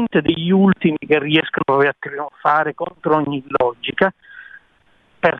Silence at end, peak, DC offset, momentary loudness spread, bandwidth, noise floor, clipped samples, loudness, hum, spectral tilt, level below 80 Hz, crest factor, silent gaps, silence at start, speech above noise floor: 0 s; -2 dBFS; under 0.1%; 8 LU; 4.4 kHz; -57 dBFS; under 0.1%; -18 LUFS; none; -8.5 dB/octave; -54 dBFS; 16 dB; none; 0 s; 40 dB